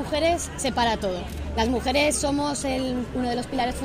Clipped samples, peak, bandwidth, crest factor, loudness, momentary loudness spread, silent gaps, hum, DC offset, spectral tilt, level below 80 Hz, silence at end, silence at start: under 0.1%; -8 dBFS; 16 kHz; 16 dB; -25 LUFS; 6 LU; none; none; under 0.1%; -4 dB/octave; -38 dBFS; 0 s; 0 s